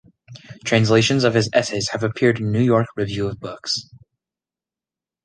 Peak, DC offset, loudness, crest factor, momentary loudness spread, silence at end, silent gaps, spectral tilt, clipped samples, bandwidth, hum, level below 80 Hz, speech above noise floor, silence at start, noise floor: -2 dBFS; under 0.1%; -19 LUFS; 20 dB; 10 LU; 1.4 s; none; -5 dB/octave; under 0.1%; 10 kHz; none; -52 dBFS; 71 dB; 0.3 s; -90 dBFS